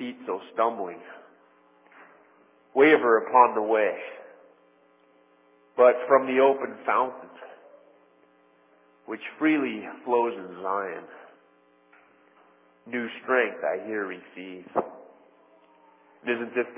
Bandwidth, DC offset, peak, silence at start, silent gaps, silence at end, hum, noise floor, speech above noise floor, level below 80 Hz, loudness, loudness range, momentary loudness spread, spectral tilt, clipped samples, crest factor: 3.7 kHz; under 0.1%; -4 dBFS; 0 s; none; 0 s; none; -61 dBFS; 37 dB; -86 dBFS; -25 LUFS; 8 LU; 21 LU; -8.5 dB/octave; under 0.1%; 24 dB